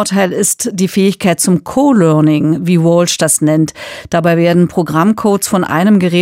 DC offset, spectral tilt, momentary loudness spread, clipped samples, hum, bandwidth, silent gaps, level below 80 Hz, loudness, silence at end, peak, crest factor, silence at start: under 0.1%; -5 dB/octave; 5 LU; under 0.1%; none; 16 kHz; none; -50 dBFS; -11 LUFS; 0 s; 0 dBFS; 10 dB; 0 s